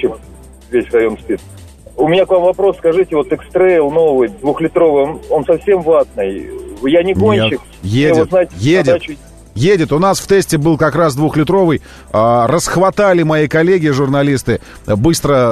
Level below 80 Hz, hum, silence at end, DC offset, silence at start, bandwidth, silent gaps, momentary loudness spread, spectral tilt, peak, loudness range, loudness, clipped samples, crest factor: -38 dBFS; none; 0 s; under 0.1%; 0 s; 13.5 kHz; none; 9 LU; -6 dB/octave; -2 dBFS; 2 LU; -13 LUFS; under 0.1%; 12 dB